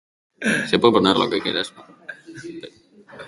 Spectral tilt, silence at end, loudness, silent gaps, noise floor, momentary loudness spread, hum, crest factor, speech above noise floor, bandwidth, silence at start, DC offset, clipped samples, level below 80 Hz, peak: -4.5 dB/octave; 0 s; -19 LUFS; none; -44 dBFS; 23 LU; none; 22 dB; 24 dB; 11.5 kHz; 0.4 s; under 0.1%; under 0.1%; -58 dBFS; 0 dBFS